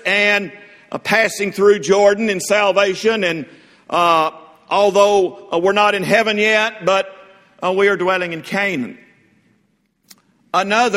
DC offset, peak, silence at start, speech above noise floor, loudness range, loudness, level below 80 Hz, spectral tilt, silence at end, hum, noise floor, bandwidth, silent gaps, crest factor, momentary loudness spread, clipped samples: under 0.1%; 0 dBFS; 0.05 s; 47 dB; 5 LU; -16 LUFS; -62 dBFS; -3.5 dB/octave; 0 s; none; -63 dBFS; 15.5 kHz; none; 16 dB; 10 LU; under 0.1%